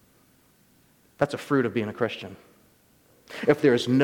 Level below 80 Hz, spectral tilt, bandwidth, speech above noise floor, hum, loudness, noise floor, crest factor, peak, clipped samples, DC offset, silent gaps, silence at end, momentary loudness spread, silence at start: -66 dBFS; -6.5 dB/octave; 18.5 kHz; 37 dB; none; -25 LUFS; -61 dBFS; 20 dB; -6 dBFS; under 0.1%; under 0.1%; none; 0 s; 17 LU; 1.2 s